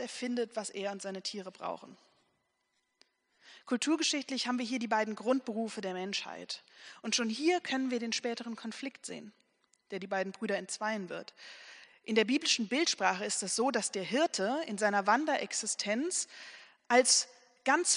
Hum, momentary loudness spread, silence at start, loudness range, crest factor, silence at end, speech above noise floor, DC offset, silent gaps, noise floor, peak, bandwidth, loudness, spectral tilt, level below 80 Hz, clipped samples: none; 15 LU; 0 s; 9 LU; 22 dB; 0 s; 47 dB; under 0.1%; none; -80 dBFS; -12 dBFS; 10.5 kHz; -32 LUFS; -2 dB/octave; -86 dBFS; under 0.1%